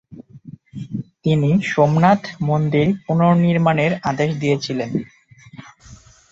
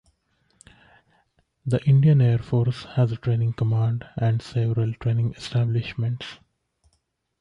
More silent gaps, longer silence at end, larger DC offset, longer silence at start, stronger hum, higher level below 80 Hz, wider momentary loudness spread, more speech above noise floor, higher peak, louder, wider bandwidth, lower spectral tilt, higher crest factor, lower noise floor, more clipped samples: neither; second, 0.35 s vs 1.05 s; neither; second, 0.1 s vs 1.65 s; neither; about the same, -54 dBFS vs -52 dBFS; first, 15 LU vs 10 LU; second, 28 dB vs 51 dB; first, -2 dBFS vs -10 dBFS; first, -18 LUFS vs -23 LUFS; second, 7.8 kHz vs 8.8 kHz; about the same, -7.5 dB/octave vs -8.5 dB/octave; about the same, 18 dB vs 14 dB; second, -45 dBFS vs -72 dBFS; neither